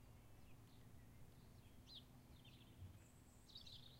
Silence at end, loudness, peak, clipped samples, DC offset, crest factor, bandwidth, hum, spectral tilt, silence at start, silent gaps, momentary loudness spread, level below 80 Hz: 0 s; -64 LUFS; -46 dBFS; under 0.1%; under 0.1%; 16 dB; 16 kHz; none; -4.5 dB/octave; 0 s; none; 7 LU; -70 dBFS